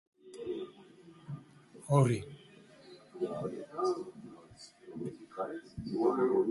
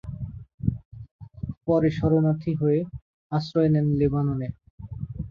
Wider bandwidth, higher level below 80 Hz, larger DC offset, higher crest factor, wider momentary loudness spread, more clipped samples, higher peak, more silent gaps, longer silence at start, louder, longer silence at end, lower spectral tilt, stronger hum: first, 11.5 kHz vs 6.6 kHz; second, -66 dBFS vs -44 dBFS; neither; first, 24 dB vs 16 dB; first, 24 LU vs 18 LU; neither; second, -12 dBFS vs -8 dBFS; second, none vs 0.54-0.58 s, 0.85-0.91 s, 1.11-1.19 s, 1.57-1.61 s, 3.02-3.30 s, 4.70-4.78 s; first, 0.25 s vs 0.05 s; second, -35 LUFS vs -24 LUFS; about the same, 0 s vs 0 s; second, -7.5 dB/octave vs -10 dB/octave; neither